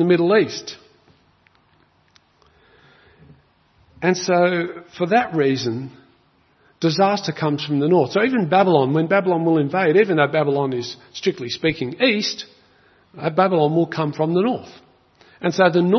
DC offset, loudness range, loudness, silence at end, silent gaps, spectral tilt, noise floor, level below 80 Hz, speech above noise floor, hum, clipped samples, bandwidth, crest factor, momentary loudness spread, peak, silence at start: under 0.1%; 7 LU; -19 LUFS; 0 s; none; -6 dB/octave; -59 dBFS; -62 dBFS; 40 dB; none; under 0.1%; 6.4 kHz; 20 dB; 11 LU; 0 dBFS; 0 s